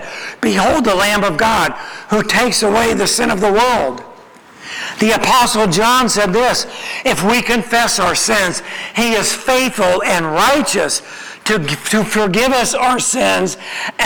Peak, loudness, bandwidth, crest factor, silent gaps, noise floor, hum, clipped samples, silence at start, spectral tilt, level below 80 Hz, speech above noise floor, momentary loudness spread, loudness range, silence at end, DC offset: 0 dBFS; -14 LUFS; over 20 kHz; 14 dB; none; -40 dBFS; none; under 0.1%; 0 s; -3 dB/octave; -40 dBFS; 26 dB; 9 LU; 2 LU; 0 s; under 0.1%